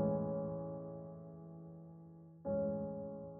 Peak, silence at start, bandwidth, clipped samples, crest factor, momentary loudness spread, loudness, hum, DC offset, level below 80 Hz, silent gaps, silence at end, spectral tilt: -24 dBFS; 0 s; 1.8 kHz; under 0.1%; 18 dB; 17 LU; -43 LUFS; none; under 0.1%; -68 dBFS; none; 0 s; -10 dB/octave